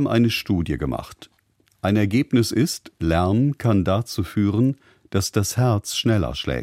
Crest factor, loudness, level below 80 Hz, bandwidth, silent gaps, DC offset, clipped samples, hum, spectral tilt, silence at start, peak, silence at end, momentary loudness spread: 16 dB; -22 LUFS; -40 dBFS; 16 kHz; none; under 0.1%; under 0.1%; none; -6 dB/octave; 0 s; -4 dBFS; 0 s; 7 LU